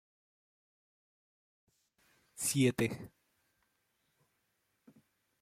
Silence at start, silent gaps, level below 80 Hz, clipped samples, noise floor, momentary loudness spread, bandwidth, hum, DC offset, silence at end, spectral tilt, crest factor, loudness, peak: 2.35 s; none; -72 dBFS; under 0.1%; -80 dBFS; 18 LU; 16.5 kHz; none; under 0.1%; 2.35 s; -4.5 dB/octave; 24 dB; -33 LUFS; -16 dBFS